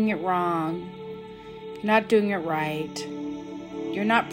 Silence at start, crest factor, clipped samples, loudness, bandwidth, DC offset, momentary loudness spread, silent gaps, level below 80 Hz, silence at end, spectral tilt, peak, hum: 0 s; 18 dB; under 0.1%; -26 LUFS; 16 kHz; under 0.1%; 16 LU; none; -62 dBFS; 0 s; -6 dB/octave; -8 dBFS; none